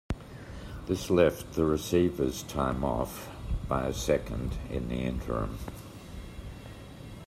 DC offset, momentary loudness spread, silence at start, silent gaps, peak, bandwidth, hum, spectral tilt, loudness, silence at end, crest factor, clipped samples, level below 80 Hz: under 0.1%; 18 LU; 0.1 s; none; -8 dBFS; 16 kHz; none; -6 dB/octave; -30 LUFS; 0 s; 22 dB; under 0.1%; -42 dBFS